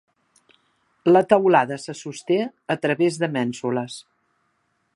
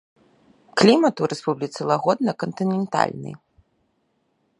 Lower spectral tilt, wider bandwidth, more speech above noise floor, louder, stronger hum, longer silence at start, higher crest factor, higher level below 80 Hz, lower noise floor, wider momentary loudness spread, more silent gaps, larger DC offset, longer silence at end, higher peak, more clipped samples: about the same, -6 dB/octave vs -5.5 dB/octave; about the same, 11.5 kHz vs 11 kHz; about the same, 49 dB vs 48 dB; about the same, -21 LUFS vs -21 LUFS; neither; first, 1.05 s vs 0.75 s; about the same, 22 dB vs 22 dB; second, -72 dBFS vs -66 dBFS; about the same, -70 dBFS vs -69 dBFS; first, 16 LU vs 11 LU; neither; neither; second, 0.95 s vs 1.25 s; about the same, -2 dBFS vs 0 dBFS; neither